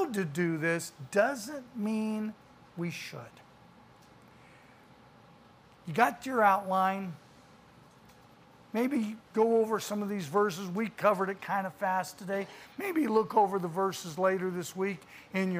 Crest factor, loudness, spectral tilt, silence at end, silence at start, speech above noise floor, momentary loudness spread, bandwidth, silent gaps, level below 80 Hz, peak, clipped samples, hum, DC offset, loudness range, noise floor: 22 dB; -31 LUFS; -5.5 dB/octave; 0 s; 0 s; 27 dB; 13 LU; 15.5 kHz; none; -74 dBFS; -10 dBFS; under 0.1%; none; under 0.1%; 9 LU; -58 dBFS